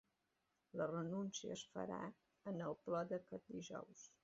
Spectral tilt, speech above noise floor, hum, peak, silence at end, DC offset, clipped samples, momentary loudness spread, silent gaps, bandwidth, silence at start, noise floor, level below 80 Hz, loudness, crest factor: -5.5 dB/octave; 40 dB; none; -30 dBFS; 0.15 s; under 0.1%; under 0.1%; 10 LU; none; 7.6 kHz; 0.75 s; -87 dBFS; -84 dBFS; -48 LUFS; 18 dB